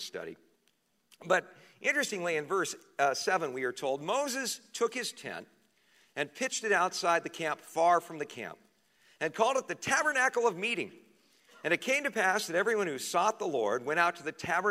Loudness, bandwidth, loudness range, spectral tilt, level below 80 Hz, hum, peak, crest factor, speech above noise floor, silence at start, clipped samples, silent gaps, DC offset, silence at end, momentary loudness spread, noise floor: -31 LUFS; 16 kHz; 3 LU; -2.5 dB/octave; -80 dBFS; none; -12 dBFS; 22 dB; 43 dB; 0 s; under 0.1%; none; under 0.1%; 0 s; 12 LU; -74 dBFS